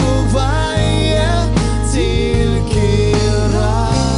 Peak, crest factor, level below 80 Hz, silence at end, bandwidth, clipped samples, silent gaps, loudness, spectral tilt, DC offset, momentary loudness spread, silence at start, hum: -2 dBFS; 12 dB; -20 dBFS; 0 s; 11 kHz; under 0.1%; none; -15 LUFS; -5.5 dB/octave; 0.5%; 2 LU; 0 s; none